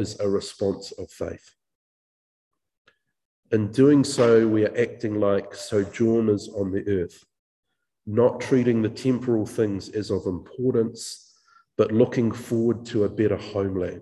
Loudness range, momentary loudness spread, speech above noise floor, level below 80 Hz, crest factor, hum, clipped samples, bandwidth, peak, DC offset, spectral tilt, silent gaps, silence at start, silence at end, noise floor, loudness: 5 LU; 15 LU; 36 dB; -52 dBFS; 18 dB; none; under 0.1%; 12.5 kHz; -6 dBFS; under 0.1%; -6.5 dB/octave; 1.75-2.51 s, 2.78-2.85 s, 3.25-3.43 s, 7.39-7.63 s; 0 s; 0 s; -59 dBFS; -23 LUFS